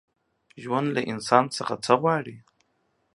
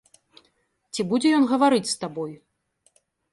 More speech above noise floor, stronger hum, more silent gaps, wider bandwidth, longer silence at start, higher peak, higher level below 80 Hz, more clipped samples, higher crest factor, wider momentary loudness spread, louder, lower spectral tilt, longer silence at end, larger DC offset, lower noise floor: about the same, 47 dB vs 46 dB; neither; neither; about the same, 11.5 kHz vs 11.5 kHz; second, 0.55 s vs 0.95 s; first, -2 dBFS vs -8 dBFS; about the same, -70 dBFS vs -70 dBFS; neither; first, 24 dB vs 16 dB; second, 9 LU vs 15 LU; about the same, -24 LUFS vs -22 LUFS; about the same, -5 dB/octave vs -4.5 dB/octave; second, 0.75 s vs 1 s; neither; about the same, -71 dBFS vs -68 dBFS